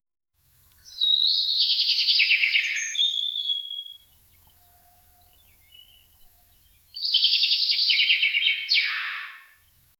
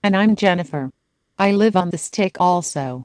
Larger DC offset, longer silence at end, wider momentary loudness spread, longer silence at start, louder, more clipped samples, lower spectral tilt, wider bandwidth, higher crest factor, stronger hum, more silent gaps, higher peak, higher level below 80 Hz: neither; first, 0.6 s vs 0 s; first, 14 LU vs 11 LU; first, 0.85 s vs 0 s; about the same, -20 LUFS vs -18 LUFS; neither; second, 4.5 dB/octave vs -5.5 dB/octave; first, over 20 kHz vs 10.5 kHz; about the same, 18 dB vs 16 dB; neither; neither; second, -8 dBFS vs -2 dBFS; second, -70 dBFS vs -60 dBFS